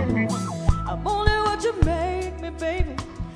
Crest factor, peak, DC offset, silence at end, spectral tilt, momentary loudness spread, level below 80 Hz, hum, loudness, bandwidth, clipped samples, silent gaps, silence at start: 20 dB; -4 dBFS; under 0.1%; 0 s; -6 dB/octave; 8 LU; -28 dBFS; none; -25 LUFS; 11 kHz; under 0.1%; none; 0 s